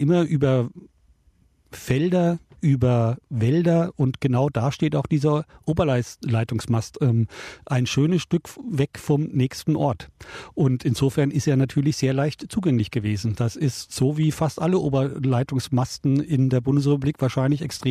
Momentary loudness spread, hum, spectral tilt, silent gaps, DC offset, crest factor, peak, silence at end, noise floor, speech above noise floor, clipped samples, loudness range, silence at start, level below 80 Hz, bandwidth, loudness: 5 LU; none; -7 dB/octave; none; under 0.1%; 14 dB; -8 dBFS; 0 s; -60 dBFS; 38 dB; under 0.1%; 2 LU; 0 s; -52 dBFS; 14.5 kHz; -23 LUFS